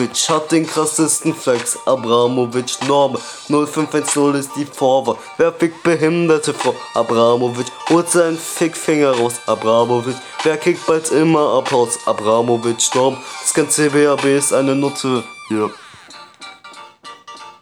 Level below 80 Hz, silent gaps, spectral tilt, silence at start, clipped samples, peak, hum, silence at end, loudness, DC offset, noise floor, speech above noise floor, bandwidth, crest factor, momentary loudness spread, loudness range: -66 dBFS; none; -4 dB/octave; 0 s; under 0.1%; -2 dBFS; none; 0.1 s; -16 LUFS; under 0.1%; -39 dBFS; 24 dB; 19.5 kHz; 14 dB; 9 LU; 2 LU